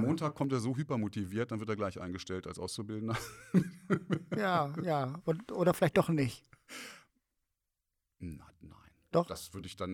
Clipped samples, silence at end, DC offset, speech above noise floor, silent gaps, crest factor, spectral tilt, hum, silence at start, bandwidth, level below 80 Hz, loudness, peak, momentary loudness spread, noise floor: under 0.1%; 0 s; under 0.1%; 52 dB; none; 22 dB; -6.5 dB/octave; none; 0 s; 18.5 kHz; -66 dBFS; -34 LUFS; -12 dBFS; 17 LU; -86 dBFS